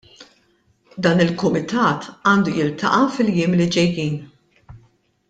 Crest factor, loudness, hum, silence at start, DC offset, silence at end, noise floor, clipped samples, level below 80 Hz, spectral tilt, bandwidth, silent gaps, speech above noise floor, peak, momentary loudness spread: 18 dB; -19 LUFS; none; 0.2 s; under 0.1%; 0.55 s; -61 dBFS; under 0.1%; -54 dBFS; -6 dB/octave; 9 kHz; none; 43 dB; -2 dBFS; 6 LU